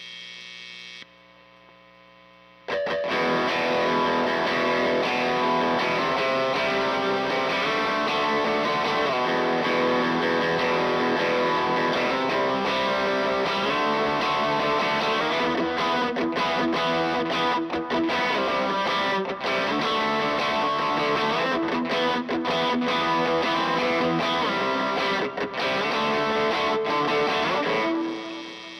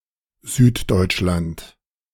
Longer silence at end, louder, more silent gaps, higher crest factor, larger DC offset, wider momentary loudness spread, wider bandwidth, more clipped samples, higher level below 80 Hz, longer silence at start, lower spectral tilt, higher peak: second, 0 s vs 0.45 s; second, -23 LUFS vs -19 LUFS; neither; second, 12 dB vs 18 dB; neither; second, 3 LU vs 17 LU; second, 13.5 kHz vs 17 kHz; neither; second, -58 dBFS vs -38 dBFS; second, 0 s vs 0.45 s; about the same, -4.5 dB/octave vs -5.5 dB/octave; second, -12 dBFS vs -2 dBFS